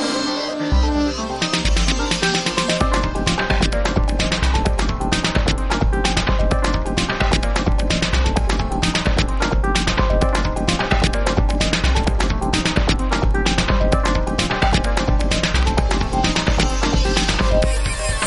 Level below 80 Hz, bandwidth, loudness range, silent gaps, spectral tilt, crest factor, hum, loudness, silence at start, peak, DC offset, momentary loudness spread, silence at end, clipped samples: -20 dBFS; 11.5 kHz; 1 LU; none; -4.5 dB/octave; 14 dB; none; -19 LUFS; 0 s; -2 dBFS; under 0.1%; 2 LU; 0 s; under 0.1%